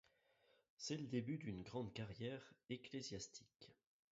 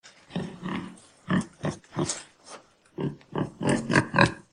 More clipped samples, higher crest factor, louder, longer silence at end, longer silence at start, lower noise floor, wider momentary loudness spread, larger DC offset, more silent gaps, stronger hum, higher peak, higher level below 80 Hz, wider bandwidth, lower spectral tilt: neither; second, 20 dB vs 28 dB; second, -50 LUFS vs -28 LUFS; first, 0.4 s vs 0.1 s; first, 0.8 s vs 0.05 s; first, -79 dBFS vs -49 dBFS; second, 15 LU vs 22 LU; neither; neither; neither; second, -32 dBFS vs -2 dBFS; second, -76 dBFS vs -56 dBFS; second, 7.6 kHz vs 10.5 kHz; about the same, -5.5 dB/octave vs -5 dB/octave